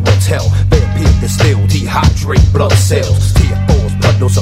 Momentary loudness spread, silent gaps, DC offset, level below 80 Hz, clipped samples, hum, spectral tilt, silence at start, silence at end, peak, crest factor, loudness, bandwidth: 2 LU; none; under 0.1%; -16 dBFS; 0.5%; none; -5.5 dB/octave; 0 s; 0 s; 0 dBFS; 10 dB; -11 LUFS; 15.5 kHz